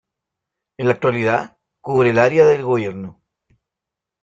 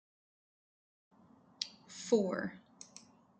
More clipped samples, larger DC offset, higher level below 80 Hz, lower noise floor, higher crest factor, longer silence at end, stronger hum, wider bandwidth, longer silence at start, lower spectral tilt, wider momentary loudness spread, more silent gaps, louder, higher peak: neither; neither; first, -58 dBFS vs -82 dBFS; first, -85 dBFS vs -60 dBFS; second, 18 dB vs 24 dB; first, 1.1 s vs 0.4 s; neither; second, 7.8 kHz vs 9.2 kHz; second, 0.8 s vs 1.6 s; first, -7 dB/octave vs -4.5 dB/octave; about the same, 21 LU vs 22 LU; neither; first, -17 LUFS vs -37 LUFS; first, -2 dBFS vs -16 dBFS